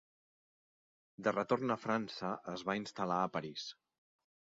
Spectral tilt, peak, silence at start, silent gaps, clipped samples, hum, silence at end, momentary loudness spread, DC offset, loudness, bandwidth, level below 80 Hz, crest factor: -4 dB/octave; -18 dBFS; 1.2 s; none; under 0.1%; none; 0.85 s; 8 LU; under 0.1%; -38 LUFS; 7.6 kHz; -78 dBFS; 20 dB